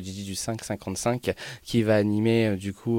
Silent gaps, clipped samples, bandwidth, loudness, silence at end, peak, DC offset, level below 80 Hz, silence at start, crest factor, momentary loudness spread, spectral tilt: none; under 0.1%; 17 kHz; -26 LUFS; 0 s; -10 dBFS; under 0.1%; -56 dBFS; 0 s; 16 dB; 10 LU; -5.5 dB/octave